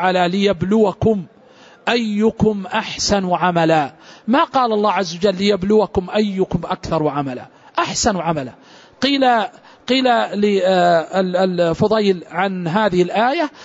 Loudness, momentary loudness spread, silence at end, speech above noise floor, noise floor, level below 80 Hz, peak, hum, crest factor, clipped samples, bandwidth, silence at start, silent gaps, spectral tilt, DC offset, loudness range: -17 LUFS; 8 LU; 0 s; 29 dB; -46 dBFS; -46 dBFS; -4 dBFS; none; 14 dB; under 0.1%; 8 kHz; 0 s; none; -5 dB/octave; under 0.1%; 3 LU